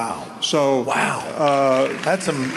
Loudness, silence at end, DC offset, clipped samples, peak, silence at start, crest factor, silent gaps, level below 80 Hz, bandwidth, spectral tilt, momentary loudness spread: -20 LUFS; 0 s; under 0.1%; under 0.1%; -6 dBFS; 0 s; 14 dB; none; -62 dBFS; 12 kHz; -4 dB/octave; 5 LU